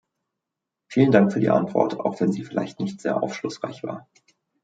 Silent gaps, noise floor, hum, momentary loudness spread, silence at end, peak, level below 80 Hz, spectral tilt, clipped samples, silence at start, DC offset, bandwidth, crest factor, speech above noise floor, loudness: none; -85 dBFS; none; 14 LU; 0.65 s; -2 dBFS; -66 dBFS; -7.5 dB/octave; under 0.1%; 0.9 s; under 0.1%; 9 kHz; 22 dB; 62 dB; -23 LUFS